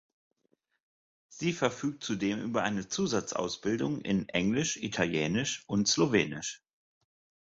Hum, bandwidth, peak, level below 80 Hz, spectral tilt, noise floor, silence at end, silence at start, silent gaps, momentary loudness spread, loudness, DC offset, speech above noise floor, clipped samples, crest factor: none; 8 kHz; -12 dBFS; -62 dBFS; -4 dB/octave; -76 dBFS; 0.85 s; 1.3 s; none; 7 LU; -31 LUFS; under 0.1%; 45 dB; under 0.1%; 20 dB